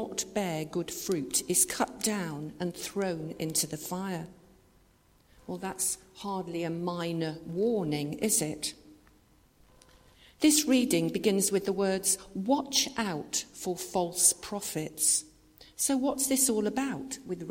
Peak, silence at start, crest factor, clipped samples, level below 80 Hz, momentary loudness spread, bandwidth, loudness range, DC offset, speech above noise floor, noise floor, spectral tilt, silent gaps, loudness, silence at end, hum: -8 dBFS; 0 s; 22 dB; under 0.1%; -64 dBFS; 12 LU; 16.5 kHz; 8 LU; under 0.1%; 33 dB; -64 dBFS; -3 dB/octave; none; -29 LUFS; 0 s; none